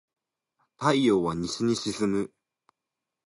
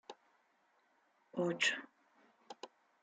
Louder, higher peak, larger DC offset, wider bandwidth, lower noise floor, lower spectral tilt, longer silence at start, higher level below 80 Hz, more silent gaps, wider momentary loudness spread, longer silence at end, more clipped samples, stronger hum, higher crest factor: first, -26 LUFS vs -37 LUFS; first, -8 dBFS vs -20 dBFS; neither; first, 11.5 kHz vs 9.4 kHz; first, -87 dBFS vs -75 dBFS; first, -5 dB/octave vs -3 dB/octave; first, 0.8 s vs 0.1 s; first, -60 dBFS vs under -90 dBFS; neither; second, 7 LU vs 23 LU; first, 1 s vs 0.35 s; neither; neither; about the same, 20 dB vs 24 dB